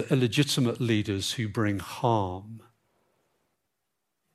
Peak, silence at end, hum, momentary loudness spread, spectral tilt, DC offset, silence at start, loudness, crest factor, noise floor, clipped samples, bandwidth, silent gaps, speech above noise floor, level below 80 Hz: -10 dBFS; 1.75 s; none; 8 LU; -5.5 dB/octave; under 0.1%; 0 s; -27 LUFS; 20 dB; -82 dBFS; under 0.1%; 15.5 kHz; none; 55 dB; -66 dBFS